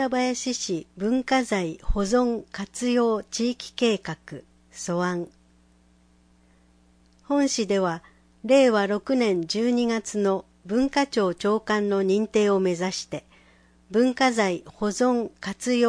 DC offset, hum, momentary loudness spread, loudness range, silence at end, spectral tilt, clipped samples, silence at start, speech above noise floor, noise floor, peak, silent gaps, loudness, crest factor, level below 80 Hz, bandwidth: under 0.1%; none; 10 LU; 7 LU; 0 s; -4.5 dB/octave; under 0.1%; 0 s; 35 dB; -59 dBFS; -8 dBFS; none; -24 LUFS; 18 dB; -44 dBFS; 10.5 kHz